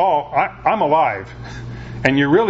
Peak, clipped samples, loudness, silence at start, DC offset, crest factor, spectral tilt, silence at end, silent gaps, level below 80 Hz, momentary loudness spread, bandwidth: 0 dBFS; under 0.1%; -17 LUFS; 0 s; under 0.1%; 18 dB; -7 dB/octave; 0 s; none; -42 dBFS; 16 LU; 7.8 kHz